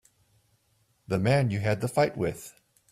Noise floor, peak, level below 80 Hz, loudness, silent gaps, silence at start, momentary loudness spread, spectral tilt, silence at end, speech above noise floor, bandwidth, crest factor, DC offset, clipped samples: -69 dBFS; -12 dBFS; -58 dBFS; -27 LUFS; none; 1.1 s; 12 LU; -6.5 dB/octave; 0.4 s; 43 dB; 15.5 kHz; 18 dB; under 0.1%; under 0.1%